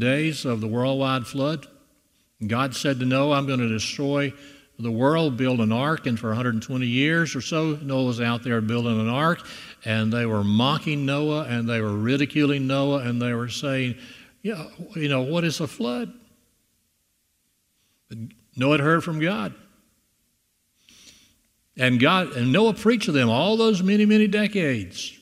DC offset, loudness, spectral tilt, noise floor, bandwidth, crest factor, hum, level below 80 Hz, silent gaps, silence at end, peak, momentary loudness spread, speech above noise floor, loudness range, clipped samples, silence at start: under 0.1%; -23 LUFS; -6 dB/octave; -70 dBFS; 15 kHz; 20 dB; none; -64 dBFS; none; 0.05 s; -2 dBFS; 12 LU; 47 dB; 8 LU; under 0.1%; 0 s